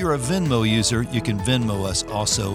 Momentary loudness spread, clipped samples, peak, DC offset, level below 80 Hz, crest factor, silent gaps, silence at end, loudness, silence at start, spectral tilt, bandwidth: 4 LU; under 0.1%; -6 dBFS; under 0.1%; -40 dBFS; 16 dB; none; 0 s; -21 LUFS; 0 s; -4.5 dB/octave; 15.5 kHz